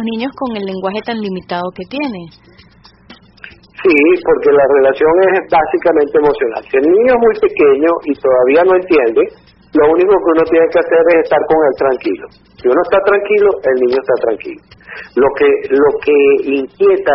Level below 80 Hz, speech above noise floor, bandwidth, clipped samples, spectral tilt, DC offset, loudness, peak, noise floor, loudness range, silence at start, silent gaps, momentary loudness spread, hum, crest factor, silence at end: -46 dBFS; 32 dB; 5.8 kHz; under 0.1%; -4 dB/octave; under 0.1%; -12 LUFS; 0 dBFS; -44 dBFS; 5 LU; 0 s; none; 11 LU; none; 12 dB; 0 s